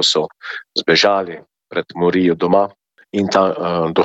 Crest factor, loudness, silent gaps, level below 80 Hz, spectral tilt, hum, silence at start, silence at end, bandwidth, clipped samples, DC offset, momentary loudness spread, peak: 16 dB; -17 LUFS; none; -56 dBFS; -4.5 dB/octave; none; 0 s; 0 s; 8.4 kHz; under 0.1%; under 0.1%; 13 LU; -2 dBFS